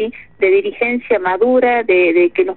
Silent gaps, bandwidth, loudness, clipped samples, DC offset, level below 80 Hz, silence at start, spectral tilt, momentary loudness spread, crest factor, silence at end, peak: none; 4.2 kHz; -14 LUFS; under 0.1%; 0.4%; -54 dBFS; 0 s; -2.5 dB/octave; 6 LU; 12 dB; 0 s; -2 dBFS